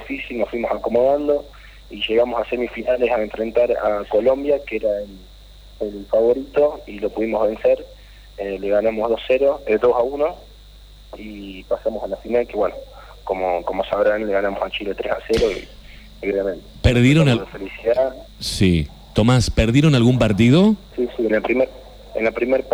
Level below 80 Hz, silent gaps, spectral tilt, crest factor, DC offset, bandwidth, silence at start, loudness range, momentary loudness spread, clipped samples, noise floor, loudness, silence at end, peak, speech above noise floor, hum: -36 dBFS; none; -6.5 dB/octave; 18 dB; under 0.1%; 19.5 kHz; 0 s; 5 LU; 13 LU; under 0.1%; -43 dBFS; -19 LUFS; 0 s; -2 dBFS; 24 dB; 50 Hz at -45 dBFS